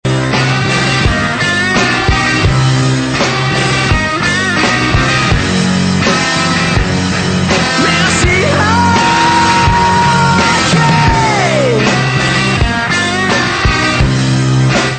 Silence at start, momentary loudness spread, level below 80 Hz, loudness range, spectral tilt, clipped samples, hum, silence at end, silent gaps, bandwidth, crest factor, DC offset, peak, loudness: 0.05 s; 3 LU; -24 dBFS; 2 LU; -4.5 dB/octave; under 0.1%; none; 0 s; none; 9.2 kHz; 10 dB; under 0.1%; 0 dBFS; -10 LUFS